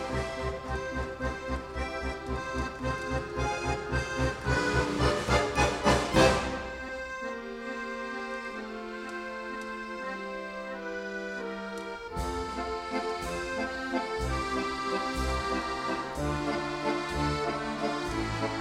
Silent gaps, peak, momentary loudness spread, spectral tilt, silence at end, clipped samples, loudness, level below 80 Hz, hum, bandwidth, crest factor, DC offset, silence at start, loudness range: none; -8 dBFS; 11 LU; -5 dB/octave; 0 s; under 0.1%; -32 LUFS; -42 dBFS; none; 15.5 kHz; 22 dB; under 0.1%; 0 s; 10 LU